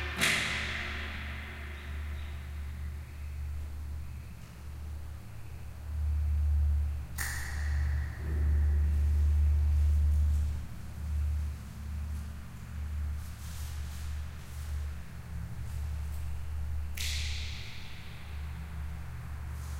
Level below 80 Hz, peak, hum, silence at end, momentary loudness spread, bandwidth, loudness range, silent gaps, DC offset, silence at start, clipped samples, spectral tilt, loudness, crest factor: -34 dBFS; -12 dBFS; none; 0 s; 15 LU; 16 kHz; 11 LU; none; under 0.1%; 0 s; under 0.1%; -4.5 dB/octave; -35 LUFS; 20 dB